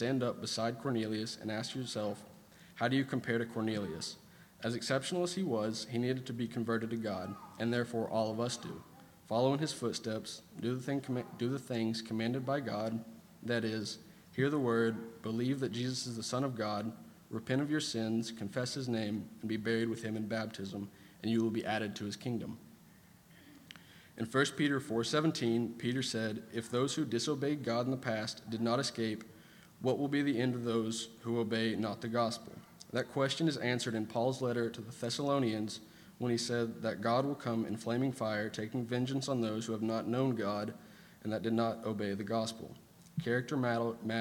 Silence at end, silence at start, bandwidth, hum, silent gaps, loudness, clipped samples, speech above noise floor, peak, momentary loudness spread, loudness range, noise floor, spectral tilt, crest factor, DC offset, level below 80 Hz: 0 s; 0 s; 19 kHz; none; none; -36 LUFS; under 0.1%; 25 dB; -14 dBFS; 10 LU; 3 LU; -60 dBFS; -5 dB/octave; 20 dB; under 0.1%; -74 dBFS